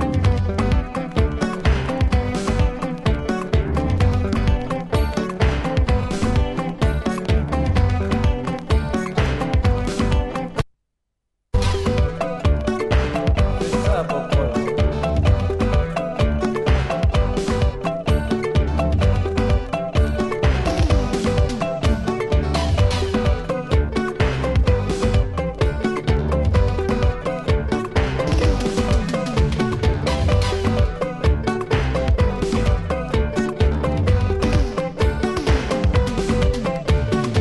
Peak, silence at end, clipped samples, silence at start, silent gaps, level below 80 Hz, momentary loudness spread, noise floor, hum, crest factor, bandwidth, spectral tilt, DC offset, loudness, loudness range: -4 dBFS; 0 s; under 0.1%; 0 s; none; -24 dBFS; 3 LU; -76 dBFS; none; 14 dB; 11.5 kHz; -7 dB/octave; under 0.1%; -21 LUFS; 1 LU